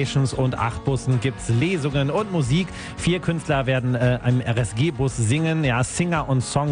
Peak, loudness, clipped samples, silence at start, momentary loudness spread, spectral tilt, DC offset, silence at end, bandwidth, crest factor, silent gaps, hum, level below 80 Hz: -6 dBFS; -22 LUFS; under 0.1%; 0 s; 3 LU; -6 dB/octave; under 0.1%; 0 s; 10 kHz; 14 dB; none; none; -40 dBFS